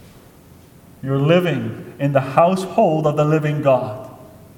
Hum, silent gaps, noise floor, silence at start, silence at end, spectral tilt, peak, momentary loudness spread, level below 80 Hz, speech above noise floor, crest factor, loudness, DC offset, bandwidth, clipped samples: none; none; -45 dBFS; 1.05 s; 0.2 s; -7.5 dB/octave; 0 dBFS; 14 LU; -56 dBFS; 28 dB; 18 dB; -18 LUFS; under 0.1%; 16.5 kHz; under 0.1%